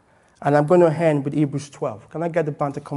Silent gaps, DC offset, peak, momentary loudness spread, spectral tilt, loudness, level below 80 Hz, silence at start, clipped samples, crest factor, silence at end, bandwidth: none; under 0.1%; -2 dBFS; 13 LU; -8 dB/octave; -21 LUFS; -62 dBFS; 0.4 s; under 0.1%; 18 dB; 0 s; 11.5 kHz